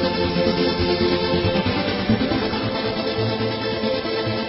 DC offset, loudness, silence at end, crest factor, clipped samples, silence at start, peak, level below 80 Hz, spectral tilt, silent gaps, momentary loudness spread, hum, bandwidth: under 0.1%; -21 LUFS; 0 s; 16 dB; under 0.1%; 0 s; -6 dBFS; -38 dBFS; -9.5 dB/octave; none; 4 LU; none; 5.8 kHz